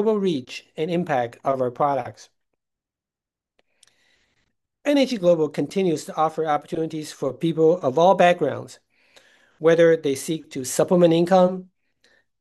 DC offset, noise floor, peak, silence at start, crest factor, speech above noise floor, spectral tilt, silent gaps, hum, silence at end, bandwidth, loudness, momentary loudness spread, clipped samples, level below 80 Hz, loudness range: under 0.1%; -89 dBFS; -4 dBFS; 0 s; 18 dB; 69 dB; -5.5 dB/octave; none; none; 0.75 s; 12.5 kHz; -21 LUFS; 12 LU; under 0.1%; -70 dBFS; 9 LU